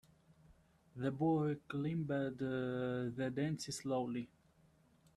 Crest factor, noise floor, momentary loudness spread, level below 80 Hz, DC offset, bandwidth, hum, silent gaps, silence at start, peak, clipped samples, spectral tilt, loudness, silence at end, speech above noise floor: 14 dB; -70 dBFS; 8 LU; -72 dBFS; under 0.1%; 13.5 kHz; none; none; 0.5 s; -26 dBFS; under 0.1%; -6.5 dB/octave; -39 LUFS; 0.9 s; 32 dB